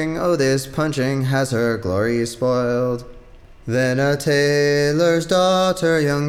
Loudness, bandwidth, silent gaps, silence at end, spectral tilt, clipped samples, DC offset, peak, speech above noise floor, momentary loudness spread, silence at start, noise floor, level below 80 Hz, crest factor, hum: -19 LUFS; 16 kHz; none; 0 s; -5.5 dB/octave; under 0.1%; under 0.1%; -6 dBFS; 24 dB; 5 LU; 0 s; -42 dBFS; -46 dBFS; 12 dB; none